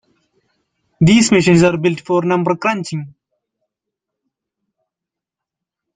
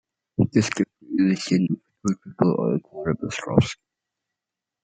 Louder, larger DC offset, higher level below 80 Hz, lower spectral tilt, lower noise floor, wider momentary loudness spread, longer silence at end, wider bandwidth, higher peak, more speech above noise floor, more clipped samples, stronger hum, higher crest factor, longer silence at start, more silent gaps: first, -14 LUFS vs -24 LUFS; neither; first, -50 dBFS vs -56 dBFS; about the same, -5.5 dB/octave vs -6.5 dB/octave; about the same, -85 dBFS vs -87 dBFS; first, 11 LU vs 7 LU; first, 2.85 s vs 1.1 s; about the same, 9.4 kHz vs 9.2 kHz; about the same, -2 dBFS vs -2 dBFS; first, 71 dB vs 65 dB; neither; neither; second, 16 dB vs 22 dB; first, 1 s vs 0.4 s; neither